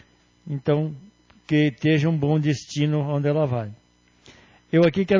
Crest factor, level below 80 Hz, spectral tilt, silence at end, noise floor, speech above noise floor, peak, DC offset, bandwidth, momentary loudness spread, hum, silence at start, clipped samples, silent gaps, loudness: 16 dB; -56 dBFS; -7.5 dB/octave; 0 s; -54 dBFS; 33 dB; -8 dBFS; under 0.1%; 7.6 kHz; 11 LU; none; 0.45 s; under 0.1%; none; -23 LUFS